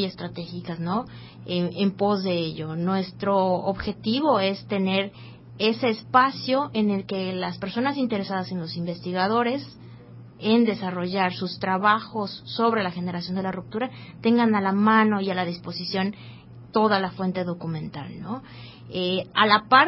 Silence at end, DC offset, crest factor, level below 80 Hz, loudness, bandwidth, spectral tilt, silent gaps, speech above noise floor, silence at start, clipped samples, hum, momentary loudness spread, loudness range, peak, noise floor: 0 s; under 0.1%; 22 dB; -58 dBFS; -24 LUFS; 5.8 kHz; -10 dB/octave; none; 20 dB; 0 s; under 0.1%; none; 14 LU; 4 LU; -2 dBFS; -44 dBFS